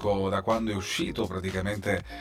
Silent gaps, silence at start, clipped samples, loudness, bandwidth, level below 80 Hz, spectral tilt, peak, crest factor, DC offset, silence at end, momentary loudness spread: none; 0 s; under 0.1%; -29 LUFS; 16 kHz; -48 dBFS; -5 dB/octave; -12 dBFS; 16 dB; under 0.1%; 0 s; 4 LU